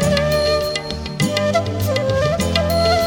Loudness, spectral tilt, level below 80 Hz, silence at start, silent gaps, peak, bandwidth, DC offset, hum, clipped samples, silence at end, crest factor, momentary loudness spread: -18 LUFS; -5 dB/octave; -32 dBFS; 0 s; none; -2 dBFS; 17.5 kHz; under 0.1%; none; under 0.1%; 0 s; 16 dB; 5 LU